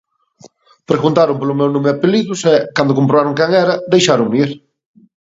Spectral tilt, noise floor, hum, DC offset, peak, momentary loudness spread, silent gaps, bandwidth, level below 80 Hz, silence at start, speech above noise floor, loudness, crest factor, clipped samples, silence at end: -5.5 dB/octave; -46 dBFS; none; under 0.1%; 0 dBFS; 4 LU; none; 8 kHz; -58 dBFS; 0.9 s; 33 dB; -14 LUFS; 14 dB; under 0.1%; 0.65 s